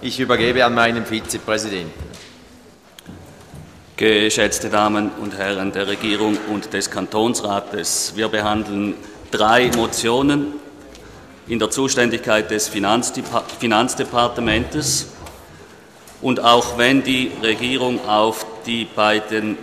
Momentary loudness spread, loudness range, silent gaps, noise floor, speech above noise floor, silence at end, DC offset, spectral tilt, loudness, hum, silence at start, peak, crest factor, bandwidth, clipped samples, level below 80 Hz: 11 LU; 3 LU; none; -46 dBFS; 27 dB; 0 s; under 0.1%; -3 dB/octave; -18 LUFS; none; 0 s; 0 dBFS; 20 dB; 15 kHz; under 0.1%; -46 dBFS